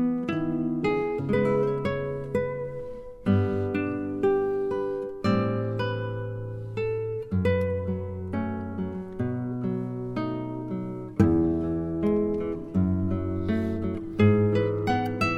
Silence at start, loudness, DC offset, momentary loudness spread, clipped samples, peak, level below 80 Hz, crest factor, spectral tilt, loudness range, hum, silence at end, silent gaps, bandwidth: 0 s; -27 LUFS; under 0.1%; 9 LU; under 0.1%; -8 dBFS; -48 dBFS; 18 dB; -9 dB/octave; 4 LU; none; 0 s; none; 9.2 kHz